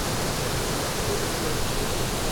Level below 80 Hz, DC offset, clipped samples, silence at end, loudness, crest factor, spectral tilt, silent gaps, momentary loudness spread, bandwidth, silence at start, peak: -34 dBFS; under 0.1%; under 0.1%; 0 s; -26 LUFS; 14 dB; -3.5 dB/octave; none; 1 LU; over 20 kHz; 0 s; -12 dBFS